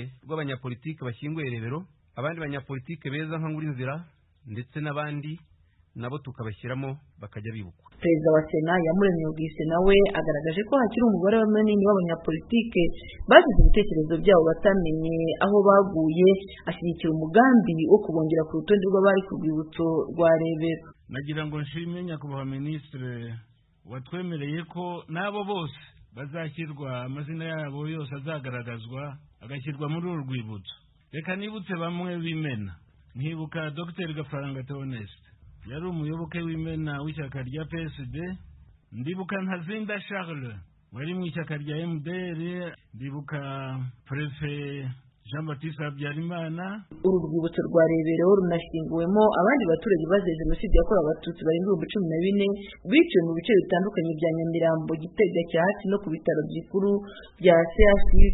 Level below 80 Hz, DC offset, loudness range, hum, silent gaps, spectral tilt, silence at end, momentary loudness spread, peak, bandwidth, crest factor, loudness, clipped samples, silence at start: -34 dBFS; under 0.1%; 13 LU; none; none; -11.5 dB/octave; 0 s; 17 LU; 0 dBFS; 4.1 kHz; 24 dB; -26 LUFS; under 0.1%; 0 s